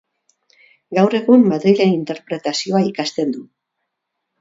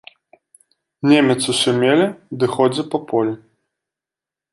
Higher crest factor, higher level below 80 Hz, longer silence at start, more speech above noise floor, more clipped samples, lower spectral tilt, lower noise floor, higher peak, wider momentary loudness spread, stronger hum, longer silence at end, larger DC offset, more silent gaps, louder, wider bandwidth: about the same, 18 dB vs 18 dB; about the same, -68 dBFS vs -64 dBFS; second, 0.9 s vs 1.05 s; second, 61 dB vs 72 dB; neither; first, -6 dB/octave vs -4.5 dB/octave; second, -77 dBFS vs -88 dBFS; about the same, 0 dBFS vs -2 dBFS; about the same, 11 LU vs 9 LU; neither; second, 1 s vs 1.15 s; neither; neither; about the same, -17 LUFS vs -17 LUFS; second, 7.8 kHz vs 11.5 kHz